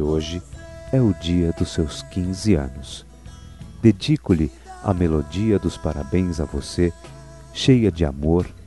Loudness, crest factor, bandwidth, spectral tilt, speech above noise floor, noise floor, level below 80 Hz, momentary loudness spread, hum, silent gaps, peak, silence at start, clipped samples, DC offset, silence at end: -21 LUFS; 20 dB; 11.5 kHz; -7 dB/octave; 20 dB; -40 dBFS; -36 dBFS; 20 LU; none; none; -2 dBFS; 0 s; under 0.1%; 0.2%; 0 s